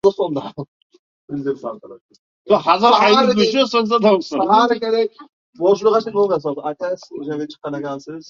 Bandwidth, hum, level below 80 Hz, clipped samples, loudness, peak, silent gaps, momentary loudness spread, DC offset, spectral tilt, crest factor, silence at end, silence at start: 7.4 kHz; none; -62 dBFS; under 0.1%; -17 LUFS; 0 dBFS; 0.68-0.90 s, 0.99-1.28 s, 2.01-2.09 s, 2.19-2.45 s, 5.29-5.53 s; 15 LU; under 0.1%; -5 dB/octave; 18 dB; 0.05 s; 0.05 s